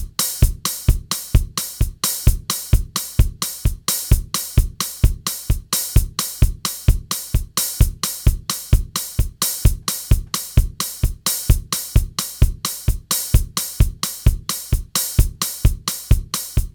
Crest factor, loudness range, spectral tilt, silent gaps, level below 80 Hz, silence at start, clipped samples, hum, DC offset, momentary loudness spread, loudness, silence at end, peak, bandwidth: 18 dB; 0 LU; -3.5 dB/octave; none; -20 dBFS; 0 s; under 0.1%; none; under 0.1%; 5 LU; -20 LUFS; 0.05 s; -2 dBFS; 19.5 kHz